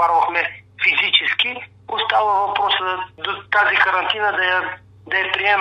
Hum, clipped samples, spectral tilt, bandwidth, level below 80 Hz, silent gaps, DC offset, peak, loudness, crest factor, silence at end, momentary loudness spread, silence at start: none; under 0.1%; -3 dB/octave; 9 kHz; -62 dBFS; none; under 0.1%; 0 dBFS; -18 LUFS; 18 dB; 0 s; 11 LU; 0 s